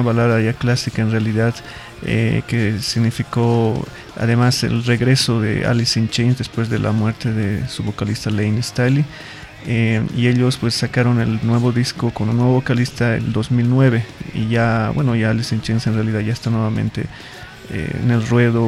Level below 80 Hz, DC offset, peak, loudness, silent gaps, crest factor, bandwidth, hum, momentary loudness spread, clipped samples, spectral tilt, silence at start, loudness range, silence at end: -42 dBFS; under 0.1%; -2 dBFS; -18 LUFS; none; 16 dB; 12.5 kHz; none; 9 LU; under 0.1%; -6 dB/octave; 0 s; 3 LU; 0 s